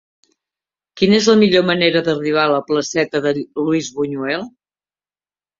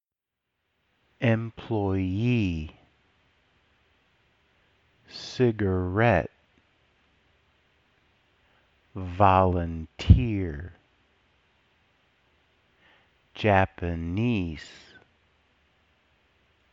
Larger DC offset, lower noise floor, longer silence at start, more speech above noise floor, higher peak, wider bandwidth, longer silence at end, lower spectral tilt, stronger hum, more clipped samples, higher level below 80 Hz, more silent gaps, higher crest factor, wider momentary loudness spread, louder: neither; first, under -90 dBFS vs -86 dBFS; second, 0.95 s vs 1.2 s; first, over 74 dB vs 62 dB; first, 0 dBFS vs -4 dBFS; about the same, 7.6 kHz vs 7.6 kHz; second, 1.1 s vs 2 s; second, -4.5 dB/octave vs -8 dB/octave; first, 50 Hz at -50 dBFS vs none; neither; second, -58 dBFS vs -40 dBFS; neither; second, 18 dB vs 26 dB; second, 10 LU vs 20 LU; first, -16 LUFS vs -25 LUFS